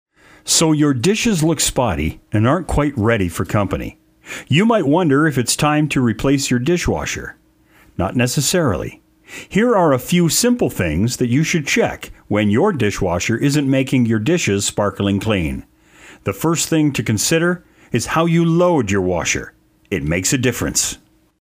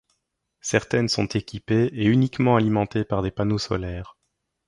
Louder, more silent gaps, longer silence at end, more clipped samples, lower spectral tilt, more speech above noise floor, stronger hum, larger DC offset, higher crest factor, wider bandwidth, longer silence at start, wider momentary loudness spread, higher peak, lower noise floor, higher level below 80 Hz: first, -17 LUFS vs -23 LUFS; neither; second, 0.45 s vs 0.65 s; neither; second, -4.5 dB/octave vs -6 dB/octave; second, 35 dB vs 54 dB; neither; neither; second, 14 dB vs 20 dB; first, 16 kHz vs 11.5 kHz; second, 0.45 s vs 0.65 s; about the same, 11 LU vs 9 LU; about the same, -2 dBFS vs -4 dBFS; second, -51 dBFS vs -76 dBFS; first, -38 dBFS vs -46 dBFS